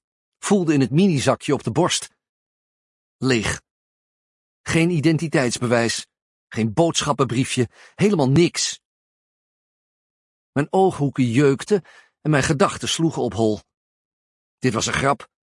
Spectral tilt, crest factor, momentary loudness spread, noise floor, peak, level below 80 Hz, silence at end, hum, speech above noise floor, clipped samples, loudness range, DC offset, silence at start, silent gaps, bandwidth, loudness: -5 dB/octave; 20 dB; 10 LU; under -90 dBFS; -2 dBFS; -52 dBFS; 0.35 s; none; over 71 dB; under 0.1%; 3 LU; under 0.1%; 0.45 s; 2.29-3.19 s, 3.71-4.64 s, 6.22-6.47 s, 8.85-10.53 s, 13.77-14.58 s; 11.5 kHz; -20 LUFS